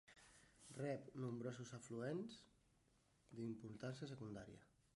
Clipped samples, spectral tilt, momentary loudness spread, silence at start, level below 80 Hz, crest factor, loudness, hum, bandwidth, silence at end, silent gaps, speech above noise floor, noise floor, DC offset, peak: under 0.1%; -6.5 dB/octave; 17 LU; 0.05 s; -80 dBFS; 18 dB; -52 LUFS; none; 11.5 kHz; 0.3 s; none; 28 dB; -79 dBFS; under 0.1%; -34 dBFS